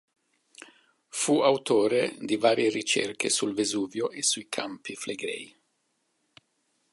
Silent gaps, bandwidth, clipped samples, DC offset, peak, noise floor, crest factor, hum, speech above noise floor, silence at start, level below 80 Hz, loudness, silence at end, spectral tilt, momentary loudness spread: none; 11.5 kHz; under 0.1%; under 0.1%; -8 dBFS; -75 dBFS; 20 dB; none; 48 dB; 0.6 s; -76 dBFS; -27 LUFS; 1.45 s; -2.5 dB/octave; 12 LU